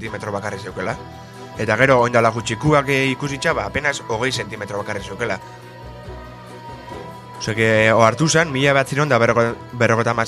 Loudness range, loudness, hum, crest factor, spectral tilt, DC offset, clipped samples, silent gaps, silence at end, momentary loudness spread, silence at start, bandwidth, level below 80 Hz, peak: 9 LU; -18 LUFS; none; 20 dB; -5 dB/octave; under 0.1%; under 0.1%; none; 0 s; 21 LU; 0 s; 13.5 kHz; -46 dBFS; 0 dBFS